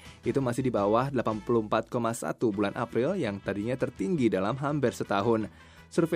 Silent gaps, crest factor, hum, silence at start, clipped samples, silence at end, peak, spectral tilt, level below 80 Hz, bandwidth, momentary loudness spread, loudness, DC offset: none; 18 dB; none; 0 s; under 0.1%; 0 s; -12 dBFS; -6.5 dB/octave; -58 dBFS; 15.5 kHz; 5 LU; -29 LUFS; under 0.1%